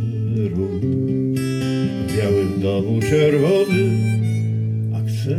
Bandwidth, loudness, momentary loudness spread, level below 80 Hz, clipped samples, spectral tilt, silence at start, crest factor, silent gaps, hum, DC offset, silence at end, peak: 14.5 kHz; -19 LUFS; 6 LU; -48 dBFS; under 0.1%; -7.5 dB/octave; 0 s; 14 dB; none; none; under 0.1%; 0 s; -4 dBFS